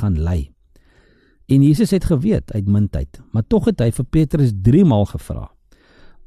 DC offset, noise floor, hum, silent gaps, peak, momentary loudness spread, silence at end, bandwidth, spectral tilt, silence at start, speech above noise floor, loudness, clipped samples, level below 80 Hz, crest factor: under 0.1%; -53 dBFS; none; none; -4 dBFS; 13 LU; 0.8 s; 13 kHz; -8.5 dB/octave; 0 s; 37 dB; -17 LUFS; under 0.1%; -32 dBFS; 14 dB